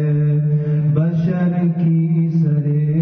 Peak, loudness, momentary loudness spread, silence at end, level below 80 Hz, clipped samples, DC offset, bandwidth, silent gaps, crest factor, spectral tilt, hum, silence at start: -6 dBFS; -17 LUFS; 1 LU; 0 s; -52 dBFS; under 0.1%; under 0.1%; 2.9 kHz; none; 10 dB; -12 dB/octave; none; 0 s